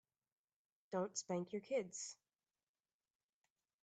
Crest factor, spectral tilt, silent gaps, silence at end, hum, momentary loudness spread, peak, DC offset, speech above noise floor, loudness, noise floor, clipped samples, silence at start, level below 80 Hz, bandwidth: 20 dB; -4 dB/octave; none; 1.7 s; none; 8 LU; -28 dBFS; under 0.1%; over 46 dB; -45 LUFS; under -90 dBFS; under 0.1%; 0.9 s; under -90 dBFS; 9 kHz